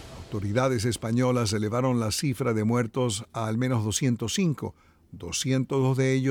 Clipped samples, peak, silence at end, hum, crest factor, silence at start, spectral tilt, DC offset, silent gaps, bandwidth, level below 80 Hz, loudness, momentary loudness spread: under 0.1%; -12 dBFS; 0 s; none; 14 dB; 0 s; -5.5 dB/octave; under 0.1%; none; 17 kHz; -54 dBFS; -26 LUFS; 7 LU